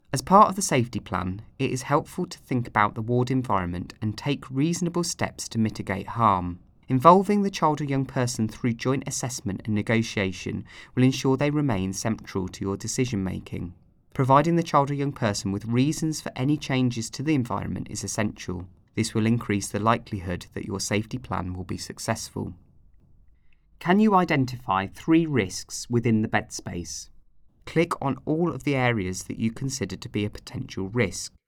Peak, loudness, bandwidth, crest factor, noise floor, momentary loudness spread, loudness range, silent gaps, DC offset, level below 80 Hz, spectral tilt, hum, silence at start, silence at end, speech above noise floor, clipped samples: -2 dBFS; -25 LUFS; 17.5 kHz; 24 dB; -55 dBFS; 13 LU; 5 LU; none; under 0.1%; -54 dBFS; -5.5 dB/octave; none; 0.1 s; 0.2 s; 31 dB; under 0.1%